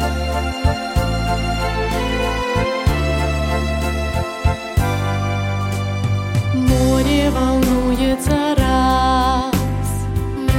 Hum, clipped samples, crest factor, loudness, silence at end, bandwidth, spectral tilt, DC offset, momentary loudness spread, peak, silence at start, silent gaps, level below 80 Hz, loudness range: none; under 0.1%; 16 dB; -18 LUFS; 0 s; 16.5 kHz; -6 dB/octave; under 0.1%; 6 LU; -2 dBFS; 0 s; none; -24 dBFS; 4 LU